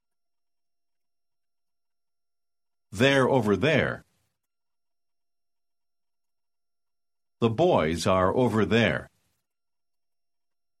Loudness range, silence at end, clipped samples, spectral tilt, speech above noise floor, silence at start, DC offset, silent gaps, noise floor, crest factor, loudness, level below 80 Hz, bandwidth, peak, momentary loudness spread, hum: 6 LU; 1.75 s; under 0.1%; -6 dB/octave; over 67 dB; 2.9 s; under 0.1%; none; under -90 dBFS; 22 dB; -24 LUFS; -58 dBFS; 14.5 kHz; -8 dBFS; 8 LU; none